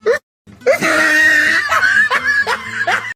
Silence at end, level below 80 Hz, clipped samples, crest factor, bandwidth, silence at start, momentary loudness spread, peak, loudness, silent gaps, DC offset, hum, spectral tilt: 0 s; -58 dBFS; under 0.1%; 12 dB; 16 kHz; 0.05 s; 9 LU; -2 dBFS; -12 LUFS; 0.23-0.45 s; under 0.1%; none; -2 dB/octave